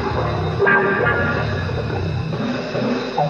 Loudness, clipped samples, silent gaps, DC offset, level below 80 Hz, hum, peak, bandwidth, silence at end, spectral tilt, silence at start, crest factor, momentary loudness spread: -20 LUFS; under 0.1%; none; under 0.1%; -38 dBFS; none; -4 dBFS; 7.4 kHz; 0 s; -7 dB/octave; 0 s; 16 dB; 8 LU